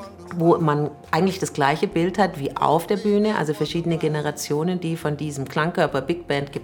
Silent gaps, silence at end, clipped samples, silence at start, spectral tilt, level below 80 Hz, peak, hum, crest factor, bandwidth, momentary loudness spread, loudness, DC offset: none; 0 s; under 0.1%; 0 s; -6 dB/octave; -54 dBFS; -4 dBFS; none; 18 dB; 18 kHz; 6 LU; -22 LUFS; under 0.1%